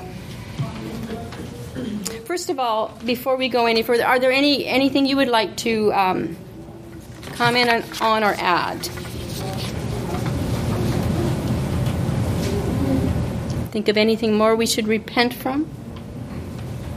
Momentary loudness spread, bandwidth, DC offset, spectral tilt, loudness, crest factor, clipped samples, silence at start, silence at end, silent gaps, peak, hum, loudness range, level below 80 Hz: 15 LU; 15.5 kHz; under 0.1%; -5 dB/octave; -21 LUFS; 20 dB; under 0.1%; 0 s; 0 s; none; -2 dBFS; none; 5 LU; -38 dBFS